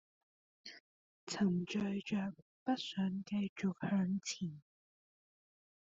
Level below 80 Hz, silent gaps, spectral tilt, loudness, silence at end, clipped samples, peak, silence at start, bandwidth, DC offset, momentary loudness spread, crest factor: -76 dBFS; 0.80-1.27 s, 2.42-2.66 s, 3.49-3.56 s; -5.5 dB/octave; -39 LUFS; 1.25 s; under 0.1%; -22 dBFS; 0.65 s; 7.8 kHz; under 0.1%; 18 LU; 18 dB